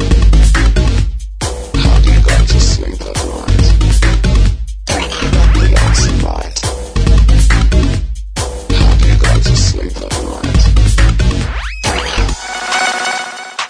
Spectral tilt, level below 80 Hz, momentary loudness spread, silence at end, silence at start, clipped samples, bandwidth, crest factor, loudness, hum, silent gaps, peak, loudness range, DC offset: -4.5 dB/octave; -12 dBFS; 10 LU; 0 s; 0 s; under 0.1%; 10.5 kHz; 10 dB; -13 LUFS; none; none; 0 dBFS; 2 LU; under 0.1%